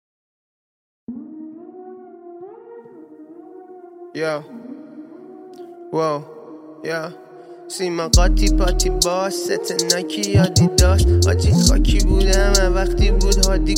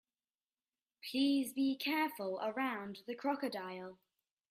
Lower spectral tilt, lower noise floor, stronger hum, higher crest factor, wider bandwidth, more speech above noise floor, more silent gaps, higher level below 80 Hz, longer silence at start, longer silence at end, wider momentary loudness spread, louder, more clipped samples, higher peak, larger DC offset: about the same, -4.5 dB/octave vs -4 dB/octave; second, -41 dBFS vs under -90 dBFS; neither; about the same, 18 dB vs 16 dB; about the same, 16.5 kHz vs 15.5 kHz; second, 25 dB vs over 53 dB; neither; first, -22 dBFS vs -84 dBFS; about the same, 1.1 s vs 1.05 s; second, 0 s vs 0.55 s; first, 24 LU vs 13 LU; first, -18 LUFS vs -37 LUFS; neither; first, 0 dBFS vs -24 dBFS; neither